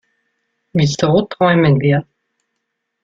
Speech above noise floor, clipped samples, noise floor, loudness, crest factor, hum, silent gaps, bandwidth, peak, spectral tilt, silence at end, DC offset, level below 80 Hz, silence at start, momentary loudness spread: 61 dB; under 0.1%; -74 dBFS; -15 LUFS; 16 dB; none; none; 7.6 kHz; -2 dBFS; -6.5 dB/octave; 1 s; under 0.1%; -50 dBFS; 0.75 s; 6 LU